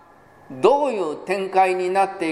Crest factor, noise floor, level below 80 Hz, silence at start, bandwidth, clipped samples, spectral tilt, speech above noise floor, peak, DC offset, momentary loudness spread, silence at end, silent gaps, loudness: 20 dB; -49 dBFS; -66 dBFS; 0.5 s; 12.5 kHz; under 0.1%; -5 dB/octave; 30 dB; -2 dBFS; under 0.1%; 8 LU; 0 s; none; -20 LUFS